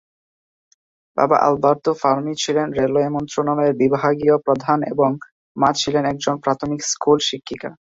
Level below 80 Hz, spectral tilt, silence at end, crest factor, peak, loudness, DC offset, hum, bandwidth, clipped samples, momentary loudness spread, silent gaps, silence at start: -56 dBFS; -4.5 dB/octave; 0.2 s; 18 dB; -2 dBFS; -19 LUFS; under 0.1%; none; 8 kHz; under 0.1%; 6 LU; 5.32-5.55 s; 1.15 s